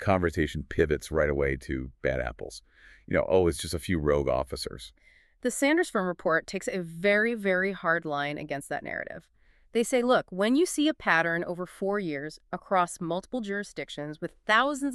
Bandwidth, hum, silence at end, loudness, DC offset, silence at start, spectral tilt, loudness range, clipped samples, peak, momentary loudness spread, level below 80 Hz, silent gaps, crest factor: 13.5 kHz; none; 0 s; -28 LUFS; under 0.1%; 0 s; -5 dB/octave; 2 LU; under 0.1%; -8 dBFS; 12 LU; -46 dBFS; none; 20 dB